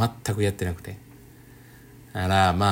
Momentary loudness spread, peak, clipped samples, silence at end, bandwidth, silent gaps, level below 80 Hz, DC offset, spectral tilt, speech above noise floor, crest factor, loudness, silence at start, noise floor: 19 LU; -8 dBFS; under 0.1%; 0 s; 16.5 kHz; none; -54 dBFS; under 0.1%; -5.5 dB/octave; 25 dB; 18 dB; -25 LUFS; 0 s; -49 dBFS